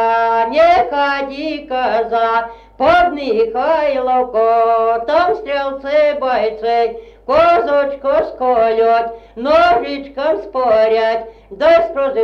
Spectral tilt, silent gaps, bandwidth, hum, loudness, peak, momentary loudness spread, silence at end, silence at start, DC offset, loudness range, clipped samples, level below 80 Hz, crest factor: -5 dB/octave; none; 6.6 kHz; 50 Hz at -50 dBFS; -15 LUFS; -2 dBFS; 8 LU; 0 s; 0 s; under 0.1%; 1 LU; under 0.1%; -44 dBFS; 12 dB